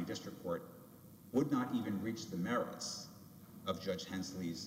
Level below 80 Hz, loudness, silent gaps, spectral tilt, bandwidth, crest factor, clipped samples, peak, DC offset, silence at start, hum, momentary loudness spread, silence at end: -74 dBFS; -40 LUFS; none; -5 dB/octave; 16 kHz; 18 dB; under 0.1%; -22 dBFS; under 0.1%; 0 s; none; 20 LU; 0 s